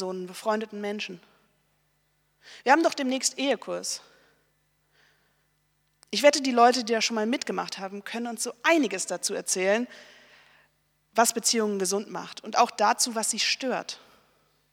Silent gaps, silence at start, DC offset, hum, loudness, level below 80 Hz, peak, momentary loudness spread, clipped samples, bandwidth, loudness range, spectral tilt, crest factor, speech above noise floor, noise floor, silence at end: none; 0 s; under 0.1%; 50 Hz at -75 dBFS; -26 LUFS; -80 dBFS; -4 dBFS; 14 LU; under 0.1%; 19 kHz; 3 LU; -2 dB/octave; 24 dB; 45 dB; -71 dBFS; 0.75 s